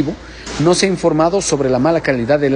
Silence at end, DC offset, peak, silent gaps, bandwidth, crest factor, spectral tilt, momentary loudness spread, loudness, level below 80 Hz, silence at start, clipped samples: 0 s; under 0.1%; -2 dBFS; none; 11 kHz; 14 dB; -5 dB/octave; 8 LU; -15 LUFS; -40 dBFS; 0 s; under 0.1%